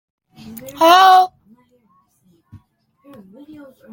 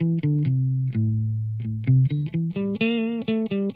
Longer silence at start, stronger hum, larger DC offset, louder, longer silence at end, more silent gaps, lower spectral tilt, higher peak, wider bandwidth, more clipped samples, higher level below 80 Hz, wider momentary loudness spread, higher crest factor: first, 0.65 s vs 0 s; neither; neither; first, -11 LUFS vs -24 LUFS; first, 2.65 s vs 0 s; neither; second, -2.5 dB/octave vs -11 dB/octave; first, 0 dBFS vs -8 dBFS; first, 17 kHz vs 4.4 kHz; neither; second, -64 dBFS vs -58 dBFS; first, 26 LU vs 6 LU; about the same, 18 dB vs 14 dB